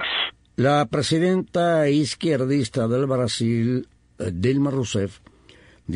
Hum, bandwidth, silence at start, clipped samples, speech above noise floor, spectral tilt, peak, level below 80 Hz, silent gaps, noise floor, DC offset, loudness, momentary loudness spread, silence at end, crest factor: none; 10.5 kHz; 0 s; under 0.1%; 30 dB; -5.5 dB/octave; -8 dBFS; -54 dBFS; none; -51 dBFS; under 0.1%; -22 LUFS; 7 LU; 0 s; 14 dB